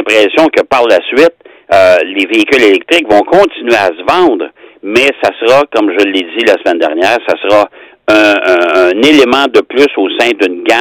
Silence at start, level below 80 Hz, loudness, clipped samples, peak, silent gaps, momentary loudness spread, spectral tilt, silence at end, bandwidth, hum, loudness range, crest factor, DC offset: 0 s; -46 dBFS; -8 LUFS; 2%; 0 dBFS; none; 5 LU; -3.5 dB/octave; 0 s; 18 kHz; none; 2 LU; 8 dB; under 0.1%